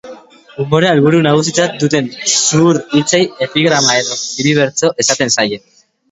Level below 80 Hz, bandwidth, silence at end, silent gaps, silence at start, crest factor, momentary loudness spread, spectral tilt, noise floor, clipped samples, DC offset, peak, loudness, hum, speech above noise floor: -54 dBFS; 8.2 kHz; 0.55 s; none; 0.05 s; 14 dB; 6 LU; -3.5 dB/octave; -36 dBFS; under 0.1%; under 0.1%; 0 dBFS; -12 LUFS; none; 23 dB